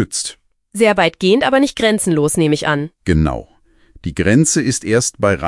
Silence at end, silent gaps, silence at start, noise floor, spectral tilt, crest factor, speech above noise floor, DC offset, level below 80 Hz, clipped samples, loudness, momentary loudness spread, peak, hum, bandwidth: 0 s; none; 0 s; -47 dBFS; -4.5 dB/octave; 16 dB; 32 dB; under 0.1%; -36 dBFS; under 0.1%; -15 LUFS; 11 LU; 0 dBFS; none; 12 kHz